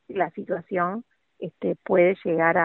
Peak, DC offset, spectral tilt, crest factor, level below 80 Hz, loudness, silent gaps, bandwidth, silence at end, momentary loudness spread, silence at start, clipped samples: -6 dBFS; under 0.1%; -10.5 dB/octave; 18 dB; -66 dBFS; -24 LUFS; none; 4.1 kHz; 0 s; 16 LU; 0.1 s; under 0.1%